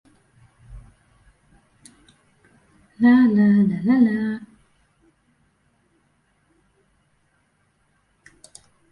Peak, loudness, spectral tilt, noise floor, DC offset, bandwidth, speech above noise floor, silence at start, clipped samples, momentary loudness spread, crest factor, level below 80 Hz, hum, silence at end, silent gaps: -6 dBFS; -18 LUFS; -8 dB/octave; -66 dBFS; under 0.1%; 11 kHz; 49 dB; 0.7 s; under 0.1%; 12 LU; 18 dB; -56 dBFS; none; 4.45 s; none